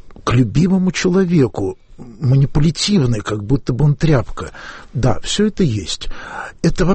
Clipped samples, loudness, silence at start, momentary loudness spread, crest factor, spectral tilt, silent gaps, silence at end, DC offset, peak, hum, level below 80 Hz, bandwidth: under 0.1%; -16 LUFS; 0.05 s; 14 LU; 12 dB; -6 dB/octave; none; 0 s; under 0.1%; -4 dBFS; none; -30 dBFS; 8.8 kHz